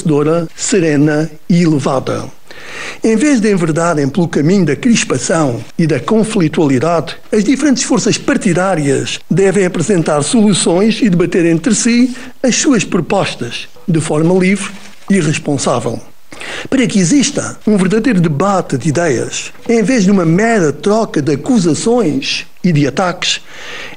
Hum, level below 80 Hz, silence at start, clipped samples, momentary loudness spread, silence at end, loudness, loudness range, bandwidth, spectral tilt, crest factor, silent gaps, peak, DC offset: none; -42 dBFS; 0 s; under 0.1%; 7 LU; 0 s; -13 LUFS; 3 LU; 15.5 kHz; -5 dB/octave; 12 dB; none; 0 dBFS; 3%